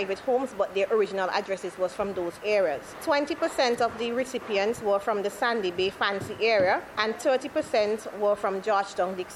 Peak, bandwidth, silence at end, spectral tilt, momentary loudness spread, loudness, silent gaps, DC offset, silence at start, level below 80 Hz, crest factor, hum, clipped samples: -8 dBFS; 15 kHz; 0 s; -4 dB/octave; 5 LU; -27 LUFS; none; under 0.1%; 0 s; -62 dBFS; 18 dB; none; under 0.1%